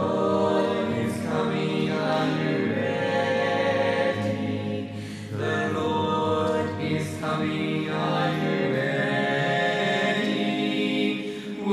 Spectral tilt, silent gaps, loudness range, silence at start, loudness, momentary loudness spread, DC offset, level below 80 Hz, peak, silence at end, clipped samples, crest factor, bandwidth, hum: -6 dB/octave; none; 2 LU; 0 s; -25 LUFS; 5 LU; under 0.1%; -66 dBFS; -10 dBFS; 0 s; under 0.1%; 14 dB; 13.5 kHz; none